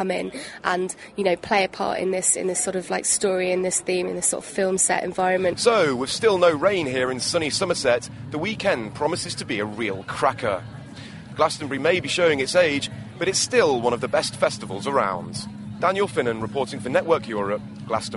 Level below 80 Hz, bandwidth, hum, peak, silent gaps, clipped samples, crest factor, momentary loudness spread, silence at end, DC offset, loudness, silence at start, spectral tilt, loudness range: -56 dBFS; 11.5 kHz; none; -4 dBFS; none; under 0.1%; 20 dB; 9 LU; 0 s; under 0.1%; -23 LUFS; 0 s; -3 dB/octave; 4 LU